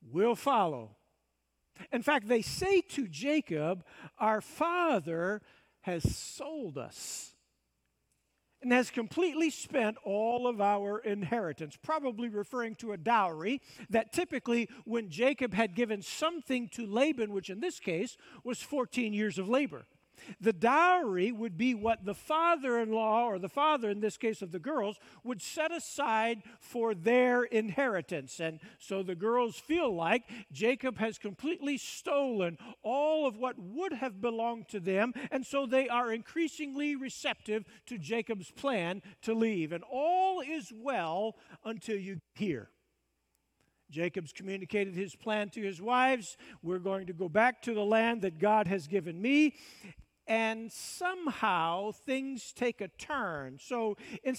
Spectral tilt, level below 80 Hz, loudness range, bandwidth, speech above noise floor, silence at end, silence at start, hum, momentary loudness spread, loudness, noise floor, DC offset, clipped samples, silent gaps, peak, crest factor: -5 dB/octave; -64 dBFS; 5 LU; 16 kHz; 47 dB; 0 s; 0 s; none; 12 LU; -33 LUFS; -80 dBFS; under 0.1%; under 0.1%; none; -12 dBFS; 20 dB